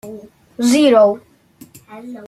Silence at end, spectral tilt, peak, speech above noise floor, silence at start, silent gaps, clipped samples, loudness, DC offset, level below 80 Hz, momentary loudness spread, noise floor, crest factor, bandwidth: 0 s; -4 dB/octave; -2 dBFS; 31 dB; 0.05 s; none; under 0.1%; -13 LUFS; under 0.1%; -60 dBFS; 24 LU; -44 dBFS; 16 dB; 15 kHz